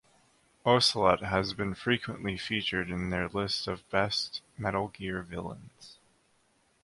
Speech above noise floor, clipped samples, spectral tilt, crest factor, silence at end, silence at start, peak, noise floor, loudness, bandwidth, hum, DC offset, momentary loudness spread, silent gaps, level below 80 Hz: 39 dB; under 0.1%; -4.5 dB/octave; 24 dB; 0.9 s; 0.65 s; -8 dBFS; -69 dBFS; -30 LUFS; 11.5 kHz; none; under 0.1%; 13 LU; none; -54 dBFS